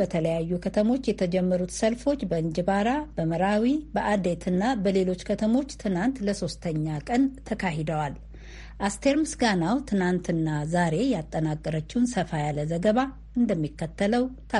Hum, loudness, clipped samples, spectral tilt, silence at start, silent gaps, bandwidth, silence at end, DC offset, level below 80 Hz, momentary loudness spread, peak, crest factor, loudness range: none; -26 LUFS; under 0.1%; -6 dB/octave; 0 s; none; 11.5 kHz; 0 s; under 0.1%; -46 dBFS; 6 LU; -10 dBFS; 16 dB; 2 LU